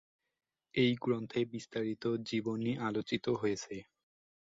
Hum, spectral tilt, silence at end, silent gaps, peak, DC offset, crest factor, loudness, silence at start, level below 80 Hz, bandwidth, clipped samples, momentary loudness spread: none; -6 dB/octave; 0.6 s; none; -18 dBFS; under 0.1%; 18 dB; -35 LUFS; 0.75 s; -72 dBFS; 7.8 kHz; under 0.1%; 8 LU